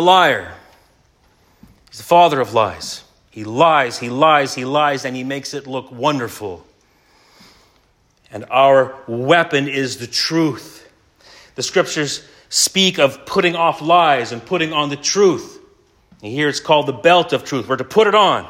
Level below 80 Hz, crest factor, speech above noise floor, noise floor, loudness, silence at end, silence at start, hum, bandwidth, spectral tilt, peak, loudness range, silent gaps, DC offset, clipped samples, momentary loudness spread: -60 dBFS; 18 dB; 41 dB; -57 dBFS; -16 LUFS; 0 s; 0 s; none; 16 kHz; -3.5 dB/octave; 0 dBFS; 5 LU; none; under 0.1%; under 0.1%; 16 LU